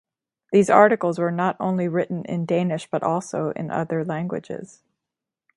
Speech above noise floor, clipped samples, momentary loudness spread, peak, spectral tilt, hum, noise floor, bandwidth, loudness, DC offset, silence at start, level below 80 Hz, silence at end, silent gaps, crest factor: 65 dB; under 0.1%; 12 LU; 0 dBFS; -7 dB/octave; none; -86 dBFS; 11.5 kHz; -22 LUFS; under 0.1%; 0.5 s; -66 dBFS; 0.9 s; none; 22 dB